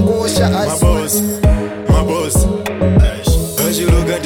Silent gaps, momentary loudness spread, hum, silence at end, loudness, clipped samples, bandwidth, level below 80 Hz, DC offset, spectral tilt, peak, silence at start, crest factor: none; 3 LU; none; 0 s; -14 LUFS; under 0.1%; 19.5 kHz; -18 dBFS; under 0.1%; -5.5 dB/octave; 0 dBFS; 0 s; 12 dB